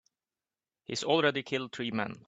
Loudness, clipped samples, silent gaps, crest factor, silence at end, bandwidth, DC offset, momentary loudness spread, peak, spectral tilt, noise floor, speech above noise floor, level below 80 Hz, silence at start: -31 LUFS; under 0.1%; none; 22 dB; 0.05 s; 9.2 kHz; under 0.1%; 11 LU; -12 dBFS; -4 dB/octave; under -90 dBFS; over 59 dB; -74 dBFS; 0.9 s